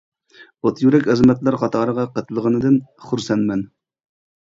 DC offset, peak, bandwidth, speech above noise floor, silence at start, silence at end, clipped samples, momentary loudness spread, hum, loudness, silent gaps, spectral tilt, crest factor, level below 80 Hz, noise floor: under 0.1%; -2 dBFS; 7.6 kHz; 32 dB; 0.4 s; 0.75 s; under 0.1%; 11 LU; none; -18 LUFS; none; -7.5 dB/octave; 18 dB; -52 dBFS; -49 dBFS